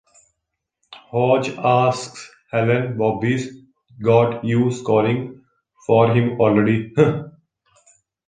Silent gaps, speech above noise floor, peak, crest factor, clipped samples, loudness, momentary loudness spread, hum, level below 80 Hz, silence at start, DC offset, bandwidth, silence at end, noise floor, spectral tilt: none; 62 dB; -2 dBFS; 18 dB; under 0.1%; -19 LUFS; 12 LU; none; -56 dBFS; 0.9 s; under 0.1%; 9.6 kHz; 1 s; -79 dBFS; -7 dB/octave